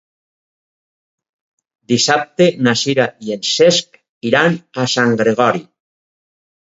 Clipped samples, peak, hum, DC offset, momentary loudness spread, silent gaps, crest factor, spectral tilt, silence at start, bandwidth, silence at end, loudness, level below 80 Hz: under 0.1%; 0 dBFS; none; under 0.1%; 7 LU; 4.09-4.21 s; 18 dB; -4 dB/octave; 1.9 s; 8 kHz; 1.05 s; -15 LUFS; -62 dBFS